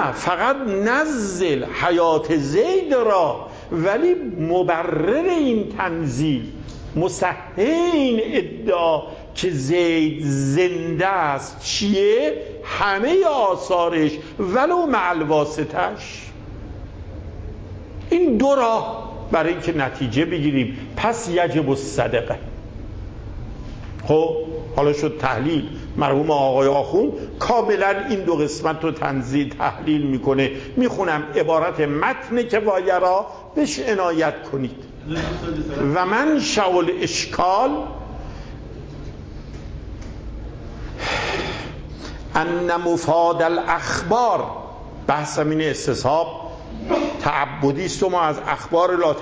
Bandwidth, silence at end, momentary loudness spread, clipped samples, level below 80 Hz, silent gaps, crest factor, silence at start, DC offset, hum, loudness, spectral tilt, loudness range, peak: 8 kHz; 0 s; 17 LU; under 0.1%; -40 dBFS; none; 16 dB; 0 s; under 0.1%; none; -20 LUFS; -5.5 dB/octave; 5 LU; -4 dBFS